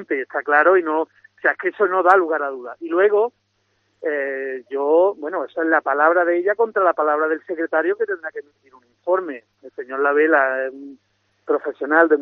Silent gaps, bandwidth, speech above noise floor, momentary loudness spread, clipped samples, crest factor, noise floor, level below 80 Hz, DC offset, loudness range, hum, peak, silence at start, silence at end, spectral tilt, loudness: none; 4.8 kHz; 48 dB; 14 LU; under 0.1%; 20 dB; -67 dBFS; -80 dBFS; under 0.1%; 4 LU; none; 0 dBFS; 0 s; 0 s; -2 dB/octave; -19 LUFS